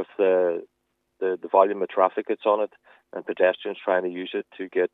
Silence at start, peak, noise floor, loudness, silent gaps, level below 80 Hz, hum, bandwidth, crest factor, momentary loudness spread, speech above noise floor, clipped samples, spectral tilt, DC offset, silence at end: 0 s; -4 dBFS; -69 dBFS; -24 LUFS; none; -84 dBFS; none; 4 kHz; 20 dB; 12 LU; 45 dB; under 0.1%; -7.5 dB/octave; under 0.1%; 0.05 s